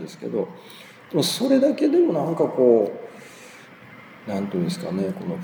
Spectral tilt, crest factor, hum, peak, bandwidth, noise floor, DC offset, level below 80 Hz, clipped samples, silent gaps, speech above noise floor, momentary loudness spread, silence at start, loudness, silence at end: -6 dB/octave; 18 dB; none; -4 dBFS; over 20 kHz; -45 dBFS; under 0.1%; -72 dBFS; under 0.1%; none; 23 dB; 24 LU; 0 s; -22 LUFS; 0 s